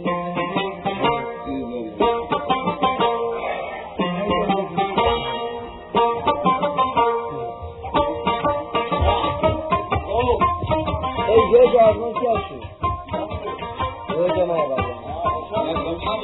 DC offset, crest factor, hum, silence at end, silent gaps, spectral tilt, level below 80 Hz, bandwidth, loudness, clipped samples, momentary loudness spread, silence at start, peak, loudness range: under 0.1%; 18 dB; none; 0 s; none; -9.5 dB/octave; -38 dBFS; 4.1 kHz; -21 LUFS; under 0.1%; 10 LU; 0 s; -2 dBFS; 5 LU